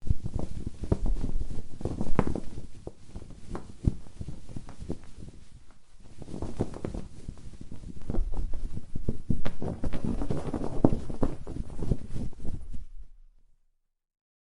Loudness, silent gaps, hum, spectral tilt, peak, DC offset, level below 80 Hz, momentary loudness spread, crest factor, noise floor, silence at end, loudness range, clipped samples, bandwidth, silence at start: -35 LUFS; none; none; -8 dB/octave; -4 dBFS; under 0.1%; -36 dBFS; 17 LU; 24 dB; -70 dBFS; 1.4 s; 8 LU; under 0.1%; 10.5 kHz; 0 s